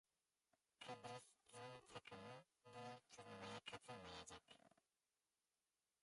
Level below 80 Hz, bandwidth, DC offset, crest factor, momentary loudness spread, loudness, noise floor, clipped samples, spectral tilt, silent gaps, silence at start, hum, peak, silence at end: -84 dBFS; 11.5 kHz; under 0.1%; 20 dB; 7 LU; -59 LUFS; under -90 dBFS; under 0.1%; -3.5 dB/octave; none; 0.8 s; none; -42 dBFS; 1.35 s